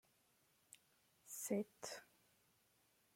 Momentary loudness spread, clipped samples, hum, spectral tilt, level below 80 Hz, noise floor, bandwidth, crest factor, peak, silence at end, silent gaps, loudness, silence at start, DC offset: 22 LU; under 0.1%; none; -4 dB/octave; under -90 dBFS; -78 dBFS; 16.5 kHz; 24 dB; -28 dBFS; 1.1 s; none; -47 LUFS; 1.25 s; under 0.1%